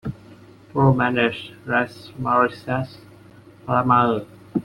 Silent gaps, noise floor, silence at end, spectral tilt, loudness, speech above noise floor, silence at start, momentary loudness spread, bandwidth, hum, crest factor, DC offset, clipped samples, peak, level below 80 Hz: none; -47 dBFS; 0 s; -8 dB/octave; -21 LUFS; 26 dB; 0.05 s; 14 LU; 11.5 kHz; none; 20 dB; under 0.1%; under 0.1%; -2 dBFS; -52 dBFS